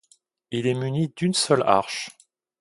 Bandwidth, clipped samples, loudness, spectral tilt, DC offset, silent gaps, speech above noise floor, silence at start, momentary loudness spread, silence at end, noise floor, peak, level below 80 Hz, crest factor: 11.5 kHz; under 0.1%; -23 LUFS; -4.5 dB/octave; under 0.1%; none; 39 dB; 0.5 s; 12 LU; 0.5 s; -62 dBFS; 0 dBFS; -64 dBFS; 24 dB